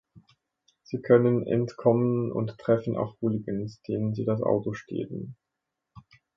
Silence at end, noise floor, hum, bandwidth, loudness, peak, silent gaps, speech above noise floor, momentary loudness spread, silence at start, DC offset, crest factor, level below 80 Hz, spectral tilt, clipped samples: 0.35 s; -84 dBFS; none; 7.4 kHz; -27 LUFS; -8 dBFS; none; 58 dB; 13 LU; 0.15 s; under 0.1%; 20 dB; -64 dBFS; -9.5 dB/octave; under 0.1%